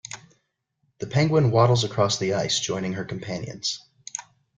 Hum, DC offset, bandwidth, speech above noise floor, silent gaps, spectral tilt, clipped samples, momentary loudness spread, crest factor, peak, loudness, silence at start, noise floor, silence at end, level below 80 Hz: none; under 0.1%; 9.4 kHz; 50 dB; none; -5 dB/octave; under 0.1%; 16 LU; 18 dB; -6 dBFS; -23 LUFS; 0.1 s; -73 dBFS; 0.35 s; -58 dBFS